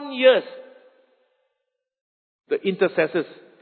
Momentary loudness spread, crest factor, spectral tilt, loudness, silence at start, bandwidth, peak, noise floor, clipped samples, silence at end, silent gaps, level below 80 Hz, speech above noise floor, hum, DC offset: 21 LU; 22 dB; -9.5 dB/octave; -21 LUFS; 0 s; 4.5 kHz; -2 dBFS; -80 dBFS; under 0.1%; 0.3 s; 2.01-2.39 s; -76 dBFS; 59 dB; none; under 0.1%